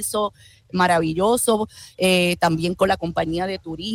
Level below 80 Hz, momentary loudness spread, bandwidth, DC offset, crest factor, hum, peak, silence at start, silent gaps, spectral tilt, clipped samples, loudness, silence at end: -48 dBFS; 10 LU; 19 kHz; under 0.1%; 16 dB; none; -6 dBFS; 0 s; none; -4 dB/octave; under 0.1%; -21 LUFS; 0 s